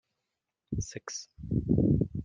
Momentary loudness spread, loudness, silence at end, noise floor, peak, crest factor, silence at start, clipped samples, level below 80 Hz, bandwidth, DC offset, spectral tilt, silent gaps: 14 LU; -31 LUFS; 0 s; -86 dBFS; -12 dBFS; 20 dB; 0.7 s; under 0.1%; -46 dBFS; 9.4 kHz; under 0.1%; -7 dB/octave; none